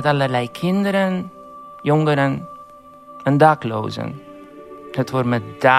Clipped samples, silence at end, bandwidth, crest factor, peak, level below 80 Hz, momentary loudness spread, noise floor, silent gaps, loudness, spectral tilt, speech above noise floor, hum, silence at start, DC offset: under 0.1%; 0 s; 14.5 kHz; 20 dB; 0 dBFS; -62 dBFS; 23 LU; -42 dBFS; none; -19 LUFS; -7 dB/octave; 24 dB; none; 0 s; under 0.1%